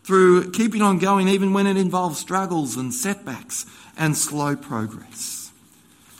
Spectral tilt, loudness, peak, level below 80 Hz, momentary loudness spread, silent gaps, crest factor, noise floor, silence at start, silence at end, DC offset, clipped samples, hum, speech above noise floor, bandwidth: -5 dB/octave; -21 LUFS; -4 dBFS; -64 dBFS; 13 LU; none; 18 dB; -53 dBFS; 0.05 s; 0.7 s; under 0.1%; under 0.1%; none; 32 dB; 16.5 kHz